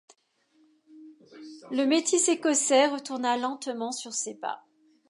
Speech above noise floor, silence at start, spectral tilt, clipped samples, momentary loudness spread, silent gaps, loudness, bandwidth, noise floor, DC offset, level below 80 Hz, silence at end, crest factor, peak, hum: 42 dB; 0.95 s; -1 dB/octave; under 0.1%; 14 LU; none; -26 LUFS; 11.5 kHz; -68 dBFS; under 0.1%; -86 dBFS; 0.5 s; 20 dB; -8 dBFS; none